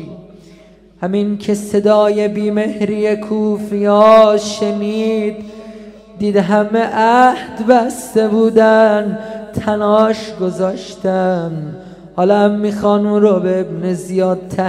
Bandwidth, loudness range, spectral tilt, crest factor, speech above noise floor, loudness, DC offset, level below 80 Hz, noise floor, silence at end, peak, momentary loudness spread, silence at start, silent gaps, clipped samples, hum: 14 kHz; 4 LU; -6.5 dB/octave; 14 dB; 30 dB; -14 LUFS; under 0.1%; -50 dBFS; -43 dBFS; 0 s; 0 dBFS; 12 LU; 0 s; none; under 0.1%; none